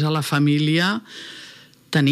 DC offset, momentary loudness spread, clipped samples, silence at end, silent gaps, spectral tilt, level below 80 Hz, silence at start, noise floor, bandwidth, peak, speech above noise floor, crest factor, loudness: under 0.1%; 19 LU; under 0.1%; 0 s; none; -5.5 dB/octave; -74 dBFS; 0 s; -45 dBFS; 14.5 kHz; -6 dBFS; 25 dB; 16 dB; -20 LUFS